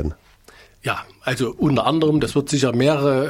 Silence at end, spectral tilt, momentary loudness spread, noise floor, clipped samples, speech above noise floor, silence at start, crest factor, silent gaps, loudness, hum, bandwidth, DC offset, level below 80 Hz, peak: 0 s; -6 dB/octave; 9 LU; -49 dBFS; under 0.1%; 30 dB; 0 s; 16 dB; none; -20 LUFS; none; 16 kHz; under 0.1%; -42 dBFS; -4 dBFS